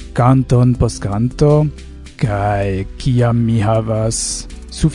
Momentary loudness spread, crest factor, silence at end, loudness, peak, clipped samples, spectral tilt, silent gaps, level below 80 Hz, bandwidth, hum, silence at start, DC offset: 9 LU; 14 dB; 0 s; -16 LUFS; 0 dBFS; under 0.1%; -6.5 dB/octave; none; -30 dBFS; 11 kHz; none; 0 s; under 0.1%